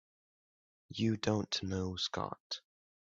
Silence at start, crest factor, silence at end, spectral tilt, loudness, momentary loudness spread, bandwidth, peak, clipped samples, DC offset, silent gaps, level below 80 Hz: 0.9 s; 22 dB; 0.55 s; -5 dB/octave; -37 LUFS; 10 LU; 7.8 kHz; -18 dBFS; under 0.1%; under 0.1%; 2.40-2.50 s; -70 dBFS